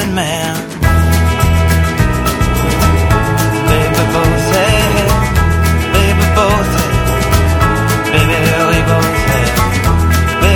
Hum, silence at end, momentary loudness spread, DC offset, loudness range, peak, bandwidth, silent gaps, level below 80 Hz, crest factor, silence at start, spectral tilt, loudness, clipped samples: none; 0 s; 3 LU; under 0.1%; 1 LU; 0 dBFS; 19.5 kHz; none; -18 dBFS; 10 dB; 0 s; -5 dB/octave; -12 LUFS; under 0.1%